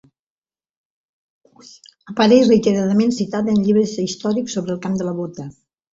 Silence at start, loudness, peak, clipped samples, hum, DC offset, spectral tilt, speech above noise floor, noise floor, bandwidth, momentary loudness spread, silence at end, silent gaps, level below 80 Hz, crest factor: 2.05 s; -17 LUFS; -2 dBFS; under 0.1%; none; under 0.1%; -6 dB/octave; over 73 dB; under -90 dBFS; 7.8 kHz; 15 LU; 0.45 s; none; -58 dBFS; 18 dB